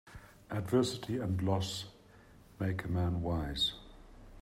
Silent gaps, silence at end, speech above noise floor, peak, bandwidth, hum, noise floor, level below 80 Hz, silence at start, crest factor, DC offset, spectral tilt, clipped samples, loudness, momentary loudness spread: none; 0 s; 25 dB; -16 dBFS; 15 kHz; none; -59 dBFS; -52 dBFS; 0.05 s; 20 dB; under 0.1%; -5.5 dB/octave; under 0.1%; -35 LUFS; 16 LU